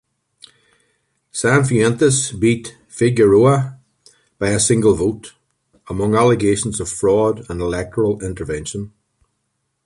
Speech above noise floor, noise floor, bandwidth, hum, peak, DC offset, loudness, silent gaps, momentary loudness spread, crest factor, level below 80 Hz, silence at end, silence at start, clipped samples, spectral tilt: 56 dB; -72 dBFS; 11.5 kHz; none; -2 dBFS; under 0.1%; -17 LUFS; none; 15 LU; 16 dB; -42 dBFS; 0.95 s; 1.35 s; under 0.1%; -5.5 dB/octave